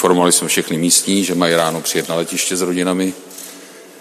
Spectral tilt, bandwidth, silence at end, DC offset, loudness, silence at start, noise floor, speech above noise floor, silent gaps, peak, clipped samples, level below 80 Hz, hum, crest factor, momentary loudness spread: -3 dB/octave; 14.5 kHz; 0 s; under 0.1%; -15 LUFS; 0 s; -38 dBFS; 22 dB; none; 0 dBFS; under 0.1%; -60 dBFS; none; 16 dB; 15 LU